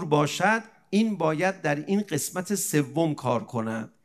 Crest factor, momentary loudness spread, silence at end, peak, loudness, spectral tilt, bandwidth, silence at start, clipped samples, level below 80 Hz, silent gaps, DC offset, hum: 18 dB; 5 LU; 0.15 s; -8 dBFS; -26 LUFS; -5 dB/octave; 14 kHz; 0 s; under 0.1%; -72 dBFS; none; under 0.1%; none